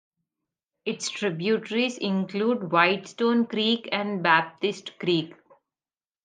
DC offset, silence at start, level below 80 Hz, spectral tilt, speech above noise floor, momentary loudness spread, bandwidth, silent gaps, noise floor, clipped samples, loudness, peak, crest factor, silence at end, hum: under 0.1%; 0.85 s; -78 dBFS; -4.5 dB/octave; over 65 dB; 9 LU; 9.6 kHz; none; under -90 dBFS; under 0.1%; -25 LUFS; -4 dBFS; 22 dB; 0.9 s; none